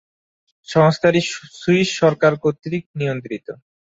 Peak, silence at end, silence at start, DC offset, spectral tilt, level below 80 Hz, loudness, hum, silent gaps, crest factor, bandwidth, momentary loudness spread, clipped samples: -2 dBFS; 0.45 s; 0.7 s; under 0.1%; -6 dB/octave; -58 dBFS; -18 LUFS; none; 2.86-2.94 s; 18 dB; 8 kHz; 13 LU; under 0.1%